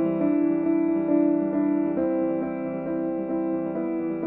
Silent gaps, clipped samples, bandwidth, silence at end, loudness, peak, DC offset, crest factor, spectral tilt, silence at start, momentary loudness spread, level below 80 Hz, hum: none; under 0.1%; 3 kHz; 0 s; -25 LUFS; -10 dBFS; under 0.1%; 14 dB; -12.5 dB/octave; 0 s; 6 LU; -60 dBFS; none